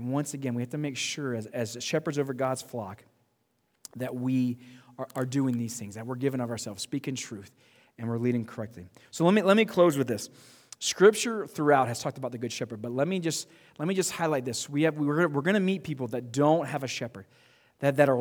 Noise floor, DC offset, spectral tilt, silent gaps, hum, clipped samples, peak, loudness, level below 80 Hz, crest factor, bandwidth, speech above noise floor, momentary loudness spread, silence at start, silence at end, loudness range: -74 dBFS; under 0.1%; -5 dB/octave; none; none; under 0.1%; -8 dBFS; -28 LUFS; -74 dBFS; 22 dB; over 20 kHz; 46 dB; 15 LU; 0 s; 0 s; 8 LU